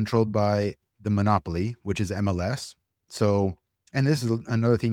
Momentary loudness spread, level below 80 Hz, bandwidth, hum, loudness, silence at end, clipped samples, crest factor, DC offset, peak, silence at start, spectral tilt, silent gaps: 9 LU; -50 dBFS; 14.5 kHz; none; -26 LUFS; 0 s; under 0.1%; 18 dB; under 0.1%; -6 dBFS; 0 s; -7 dB/octave; none